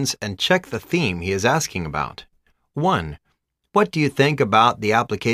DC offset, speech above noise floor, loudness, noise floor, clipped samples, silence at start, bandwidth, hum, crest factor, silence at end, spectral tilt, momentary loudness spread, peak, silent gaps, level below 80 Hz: under 0.1%; 50 dB; -20 LUFS; -71 dBFS; under 0.1%; 0 s; 15.5 kHz; none; 18 dB; 0 s; -4.5 dB/octave; 10 LU; -2 dBFS; none; -48 dBFS